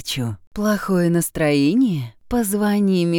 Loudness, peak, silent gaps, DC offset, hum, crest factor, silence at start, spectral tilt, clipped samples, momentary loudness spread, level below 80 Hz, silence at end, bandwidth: -20 LUFS; -6 dBFS; 0.47-0.51 s; under 0.1%; none; 12 dB; 0 s; -5.5 dB/octave; under 0.1%; 8 LU; -44 dBFS; 0 s; 20 kHz